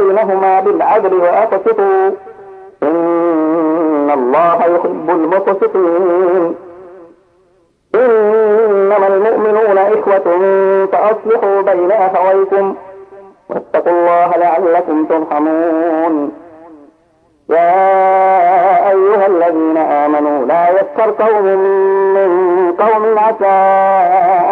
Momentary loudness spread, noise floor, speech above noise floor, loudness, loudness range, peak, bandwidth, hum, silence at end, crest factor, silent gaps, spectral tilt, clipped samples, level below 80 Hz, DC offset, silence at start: 5 LU; -53 dBFS; 43 dB; -11 LUFS; 3 LU; 0 dBFS; 4.2 kHz; none; 0 s; 10 dB; none; -8.5 dB/octave; under 0.1%; -64 dBFS; under 0.1%; 0 s